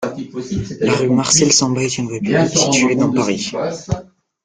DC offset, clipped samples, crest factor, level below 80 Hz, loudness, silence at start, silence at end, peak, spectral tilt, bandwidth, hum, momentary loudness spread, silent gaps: under 0.1%; under 0.1%; 16 dB; -46 dBFS; -16 LUFS; 0 s; 0.4 s; 0 dBFS; -3.5 dB/octave; 10 kHz; none; 13 LU; none